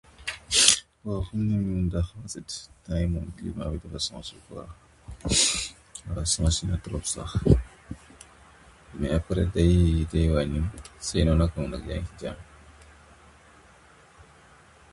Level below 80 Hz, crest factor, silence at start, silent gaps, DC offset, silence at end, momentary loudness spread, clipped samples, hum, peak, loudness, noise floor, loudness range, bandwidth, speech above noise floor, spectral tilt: -34 dBFS; 28 dB; 0.2 s; none; under 0.1%; 2.1 s; 19 LU; under 0.1%; none; 0 dBFS; -26 LUFS; -54 dBFS; 7 LU; 11.5 kHz; 28 dB; -4 dB/octave